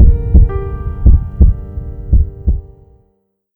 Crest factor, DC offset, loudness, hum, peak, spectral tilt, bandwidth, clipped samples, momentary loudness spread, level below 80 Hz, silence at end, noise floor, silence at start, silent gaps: 12 dB; under 0.1%; -15 LUFS; none; 0 dBFS; -13 dB/octave; 2.3 kHz; under 0.1%; 12 LU; -12 dBFS; 0.9 s; -61 dBFS; 0 s; none